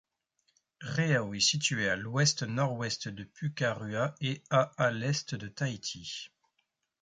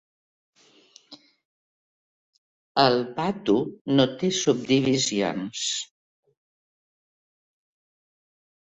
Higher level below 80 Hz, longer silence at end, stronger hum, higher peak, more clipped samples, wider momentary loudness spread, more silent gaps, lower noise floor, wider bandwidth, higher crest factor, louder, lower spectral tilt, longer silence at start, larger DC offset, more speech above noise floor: about the same, -66 dBFS vs -64 dBFS; second, 0.75 s vs 2.9 s; neither; second, -14 dBFS vs -4 dBFS; neither; first, 12 LU vs 8 LU; second, none vs 1.45-2.75 s, 3.81-3.85 s; first, -80 dBFS vs -56 dBFS; first, 9.6 kHz vs 8.4 kHz; about the same, 20 dB vs 24 dB; second, -31 LUFS vs -24 LUFS; about the same, -4 dB/octave vs -4 dB/octave; second, 0.8 s vs 1.1 s; neither; first, 48 dB vs 33 dB